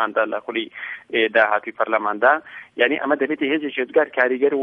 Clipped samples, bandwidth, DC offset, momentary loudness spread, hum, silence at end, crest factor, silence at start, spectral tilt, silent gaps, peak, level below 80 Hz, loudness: under 0.1%; 5.4 kHz; under 0.1%; 9 LU; none; 0 s; 18 dB; 0 s; -6.5 dB/octave; none; -2 dBFS; -74 dBFS; -20 LUFS